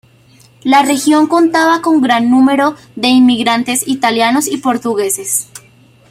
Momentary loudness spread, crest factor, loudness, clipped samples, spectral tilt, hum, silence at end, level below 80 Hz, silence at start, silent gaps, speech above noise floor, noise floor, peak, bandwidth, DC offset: 7 LU; 12 dB; -12 LUFS; under 0.1%; -2.5 dB/octave; none; 0.5 s; -56 dBFS; 0.65 s; none; 34 dB; -45 dBFS; 0 dBFS; 16 kHz; under 0.1%